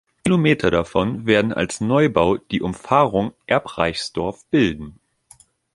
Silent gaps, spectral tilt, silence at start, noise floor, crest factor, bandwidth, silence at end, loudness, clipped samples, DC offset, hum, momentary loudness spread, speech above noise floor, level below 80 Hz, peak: none; -6 dB/octave; 0.25 s; -53 dBFS; 18 dB; 11.5 kHz; 0.85 s; -20 LUFS; under 0.1%; under 0.1%; none; 8 LU; 33 dB; -44 dBFS; -2 dBFS